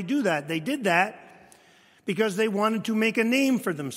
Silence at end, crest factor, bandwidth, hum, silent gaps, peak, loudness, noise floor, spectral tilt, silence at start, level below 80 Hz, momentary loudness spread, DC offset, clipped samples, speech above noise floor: 0 s; 20 dB; 16 kHz; none; none; -6 dBFS; -25 LUFS; -57 dBFS; -5 dB/octave; 0 s; -76 dBFS; 7 LU; under 0.1%; under 0.1%; 33 dB